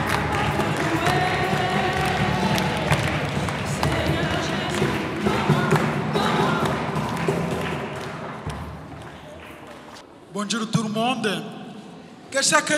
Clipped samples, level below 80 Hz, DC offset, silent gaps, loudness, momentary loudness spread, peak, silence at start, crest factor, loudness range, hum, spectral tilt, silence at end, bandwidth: under 0.1%; -44 dBFS; under 0.1%; none; -23 LUFS; 18 LU; -2 dBFS; 0 s; 22 dB; 8 LU; none; -4.5 dB/octave; 0 s; 16 kHz